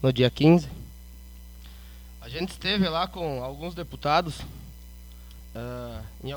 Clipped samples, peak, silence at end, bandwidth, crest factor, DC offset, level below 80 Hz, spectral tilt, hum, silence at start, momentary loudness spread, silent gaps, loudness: under 0.1%; -6 dBFS; 0 s; over 20 kHz; 22 dB; under 0.1%; -44 dBFS; -6.5 dB/octave; 60 Hz at -45 dBFS; 0 s; 26 LU; none; -26 LUFS